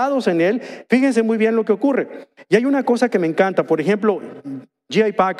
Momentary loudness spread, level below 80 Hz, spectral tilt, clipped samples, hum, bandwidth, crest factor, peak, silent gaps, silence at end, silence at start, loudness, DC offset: 14 LU; -70 dBFS; -6.5 dB/octave; under 0.1%; none; 12 kHz; 16 dB; -2 dBFS; none; 0 s; 0 s; -18 LUFS; under 0.1%